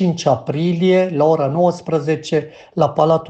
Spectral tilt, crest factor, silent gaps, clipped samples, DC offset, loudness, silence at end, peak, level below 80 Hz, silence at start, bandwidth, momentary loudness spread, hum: -7 dB/octave; 16 dB; none; under 0.1%; under 0.1%; -17 LUFS; 0 s; 0 dBFS; -58 dBFS; 0 s; 8.4 kHz; 6 LU; none